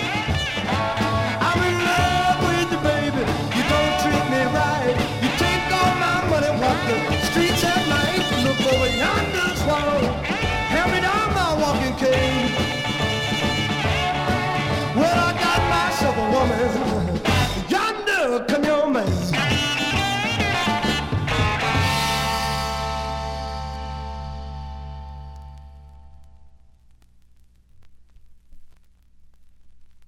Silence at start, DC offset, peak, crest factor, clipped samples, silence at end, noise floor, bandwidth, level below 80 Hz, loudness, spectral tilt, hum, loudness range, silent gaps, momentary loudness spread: 0 s; under 0.1%; -6 dBFS; 16 dB; under 0.1%; 0 s; -52 dBFS; 16.5 kHz; -36 dBFS; -21 LUFS; -4.5 dB/octave; none; 7 LU; none; 7 LU